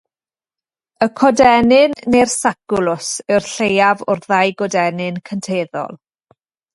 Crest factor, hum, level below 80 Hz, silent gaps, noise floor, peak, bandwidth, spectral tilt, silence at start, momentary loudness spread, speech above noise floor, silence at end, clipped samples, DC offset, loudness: 16 dB; none; -50 dBFS; none; under -90 dBFS; 0 dBFS; 11.5 kHz; -4 dB/octave; 1 s; 12 LU; over 75 dB; 0.8 s; under 0.1%; under 0.1%; -15 LUFS